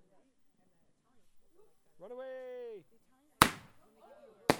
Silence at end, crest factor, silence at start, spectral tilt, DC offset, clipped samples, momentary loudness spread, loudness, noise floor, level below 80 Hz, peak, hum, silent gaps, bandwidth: 0 s; 38 dB; 1.35 s; -3 dB/octave; under 0.1%; under 0.1%; 22 LU; -32 LUFS; -70 dBFS; -60 dBFS; 0 dBFS; none; none; 19.5 kHz